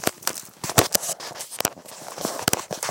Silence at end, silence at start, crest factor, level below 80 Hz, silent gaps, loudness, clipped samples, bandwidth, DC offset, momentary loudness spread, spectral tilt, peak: 0 s; 0 s; 26 dB; -54 dBFS; none; -24 LUFS; under 0.1%; 17.5 kHz; under 0.1%; 13 LU; -2 dB/octave; 0 dBFS